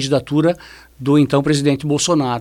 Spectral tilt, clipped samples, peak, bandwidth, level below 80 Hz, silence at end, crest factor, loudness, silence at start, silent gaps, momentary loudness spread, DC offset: -5.5 dB/octave; under 0.1%; -2 dBFS; 13 kHz; -48 dBFS; 0 s; 14 dB; -16 LUFS; 0 s; none; 6 LU; under 0.1%